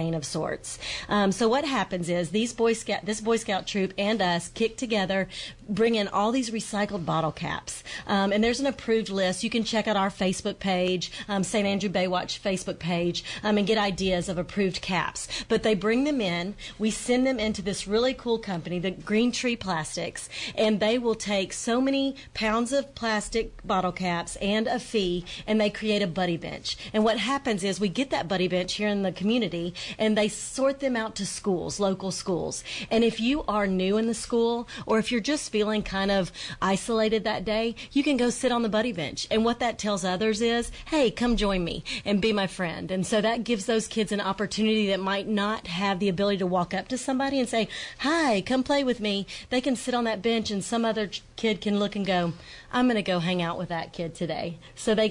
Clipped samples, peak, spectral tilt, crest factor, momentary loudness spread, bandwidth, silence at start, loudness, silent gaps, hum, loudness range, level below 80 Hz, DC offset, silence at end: under 0.1%; -14 dBFS; -4.5 dB/octave; 12 dB; 7 LU; 11 kHz; 0 s; -27 LUFS; none; none; 1 LU; -50 dBFS; under 0.1%; 0 s